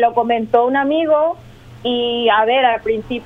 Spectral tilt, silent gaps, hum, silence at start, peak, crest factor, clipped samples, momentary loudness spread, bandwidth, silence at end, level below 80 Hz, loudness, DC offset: -6 dB/octave; none; none; 0 s; 0 dBFS; 16 dB; under 0.1%; 7 LU; 5.2 kHz; 0 s; -48 dBFS; -16 LUFS; under 0.1%